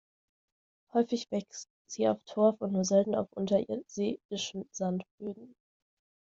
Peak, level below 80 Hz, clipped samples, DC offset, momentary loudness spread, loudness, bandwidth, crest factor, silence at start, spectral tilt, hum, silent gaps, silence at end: -12 dBFS; -74 dBFS; under 0.1%; under 0.1%; 15 LU; -31 LUFS; 7.8 kHz; 20 dB; 0.95 s; -5.5 dB/octave; none; 1.70-1.85 s, 4.25-4.29 s, 5.11-5.18 s; 0.8 s